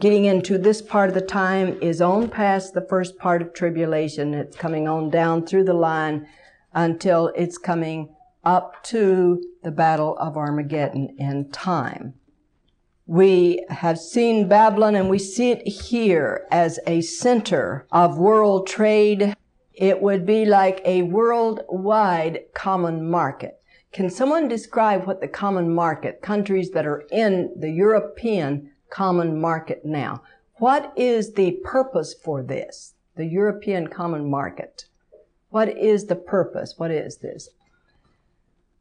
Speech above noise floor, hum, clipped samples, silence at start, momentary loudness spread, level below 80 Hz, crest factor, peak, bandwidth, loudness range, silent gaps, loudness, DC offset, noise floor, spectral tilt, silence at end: 46 dB; none; under 0.1%; 0 s; 11 LU; -58 dBFS; 16 dB; -6 dBFS; 10.5 kHz; 6 LU; none; -21 LUFS; under 0.1%; -66 dBFS; -6.5 dB/octave; 1.35 s